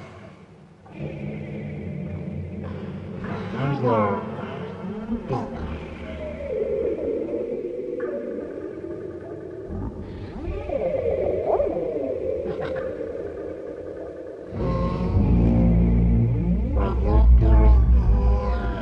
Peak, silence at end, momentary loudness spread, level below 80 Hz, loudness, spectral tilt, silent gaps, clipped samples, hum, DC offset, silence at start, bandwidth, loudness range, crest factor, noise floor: -6 dBFS; 0 s; 16 LU; -26 dBFS; -25 LUFS; -10 dB/octave; none; under 0.1%; none; under 0.1%; 0 s; 5.2 kHz; 11 LU; 18 dB; -47 dBFS